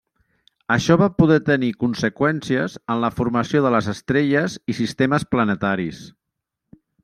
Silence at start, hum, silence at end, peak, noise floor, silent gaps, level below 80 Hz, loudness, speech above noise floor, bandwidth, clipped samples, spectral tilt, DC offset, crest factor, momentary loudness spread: 0.7 s; none; 0.95 s; -2 dBFS; -80 dBFS; none; -50 dBFS; -20 LUFS; 61 dB; 13.5 kHz; under 0.1%; -6.5 dB/octave; under 0.1%; 18 dB; 9 LU